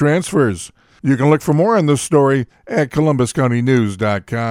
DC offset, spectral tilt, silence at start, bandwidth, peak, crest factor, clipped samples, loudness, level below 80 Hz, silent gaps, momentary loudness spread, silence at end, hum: under 0.1%; -6.5 dB/octave; 0 s; 15 kHz; 0 dBFS; 14 dB; under 0.1%; -16 LUFS; -48 dBFS; none; 6 LU; 0 s; none